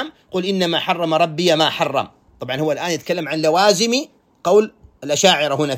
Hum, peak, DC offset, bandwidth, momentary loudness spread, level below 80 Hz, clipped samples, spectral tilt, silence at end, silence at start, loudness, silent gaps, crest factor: none; 0 dBFS; under 0.1%; 16.5 kHz; 12 LU; -60 dBFS; under 0.1%; -3.5 dB/octave; 0 s; 0 s; -18 LUFS; none; 18 dB